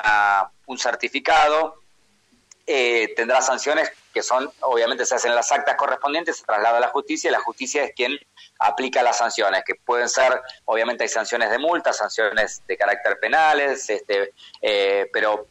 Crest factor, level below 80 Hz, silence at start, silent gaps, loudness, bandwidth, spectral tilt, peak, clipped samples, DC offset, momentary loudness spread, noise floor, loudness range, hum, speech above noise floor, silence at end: 14 dB; -60 dBFS; 0 s; none; -21 LUFS; 15.5 kHz; -0.5 dB/octave; -8 dBFS; under 0.1%; under 0.1%; 7 LU; -61 dBFS; 1 LU; none; 40 dB; 0.05 s